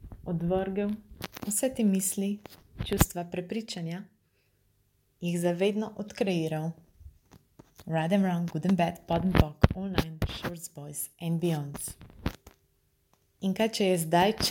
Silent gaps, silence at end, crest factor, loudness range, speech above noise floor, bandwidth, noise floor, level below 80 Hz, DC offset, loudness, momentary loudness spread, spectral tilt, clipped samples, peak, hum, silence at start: none; 0 s; 26 dB; 6 LU; 42 dB; 17 kHz; -70 dBFS; -44 dBFS; under 0.1%; -30 LUFS; 13 LU; -5 dB/octave; under 0.1%; -4 dBFS; none; 0 s